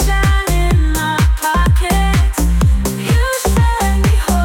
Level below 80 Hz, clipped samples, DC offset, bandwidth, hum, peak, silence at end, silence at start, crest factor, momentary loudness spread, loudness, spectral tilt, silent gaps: -16 dBFS; under 0.1%; under 0.1%; 17.5 kHz; none; -4 dBFS; 0 s; 0 s; 8 dB; 2 LU; -14 LUFS; -5 dB/octave; none